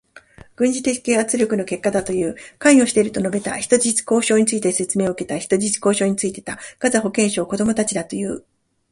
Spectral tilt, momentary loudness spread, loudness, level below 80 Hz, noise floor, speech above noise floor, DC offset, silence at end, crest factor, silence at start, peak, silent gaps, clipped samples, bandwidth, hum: -4 dB/octave; 9 LU; -19 LUFS; -54 dBFS; -45 dBFS; 27 dB; under 0.1%; 0.5 s; 20 dB; 0.15 s; 0 dBFS; none; under 0.1%; 11.5 kHz; none